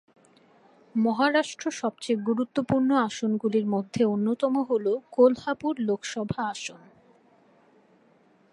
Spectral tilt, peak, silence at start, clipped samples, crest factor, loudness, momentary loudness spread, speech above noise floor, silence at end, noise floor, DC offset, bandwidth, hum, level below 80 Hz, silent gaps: -5.5 dB/octave; -6 dBFS; 0.95 s; under 0.1%; 20 dB; -26 LUFS; 10 LU; 36 dB; 1.75 s; -61 dBFS; under 0.1%; 11 kHz; none; -64 dBFS; none